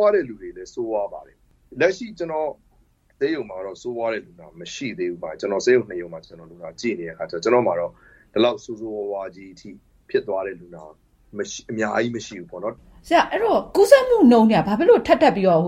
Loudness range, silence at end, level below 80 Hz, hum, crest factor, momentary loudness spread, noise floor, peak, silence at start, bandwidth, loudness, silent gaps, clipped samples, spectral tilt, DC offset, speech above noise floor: 11 LU; 0 s; -54 dBFS; none; 20 dB; 20 LU; -59 dBFS; 0 dBFS; 0 s; 16 kHz; -21 LUFS; none; under 0.1%; -5.5 dB/octave; under 0.1%; 38 dB